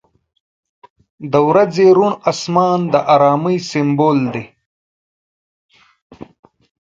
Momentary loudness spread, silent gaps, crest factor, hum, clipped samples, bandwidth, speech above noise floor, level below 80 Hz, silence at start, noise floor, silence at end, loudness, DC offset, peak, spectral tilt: 8 LU; 4.66-5.69 s, 6.02-6.10 s; 16 dB; none; under 0.1%; 7.8 kHz; over 77 dB; -60 dBFS; 1.2 s; under -90 dBFS; 0.6 s; -14 LUFS; under 0.1%; 0 dBFS; -6.5 dB/octave